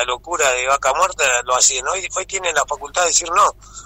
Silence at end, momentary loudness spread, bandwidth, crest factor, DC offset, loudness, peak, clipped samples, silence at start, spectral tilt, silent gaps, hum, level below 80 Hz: 0 s; 7 LU; 16 kHz; 14 dB; under 0.1%; -17 LUFS; -4 dBFS; under 0.1%; 0 s; 0.5 dB/octave; none; none; -46 dBFS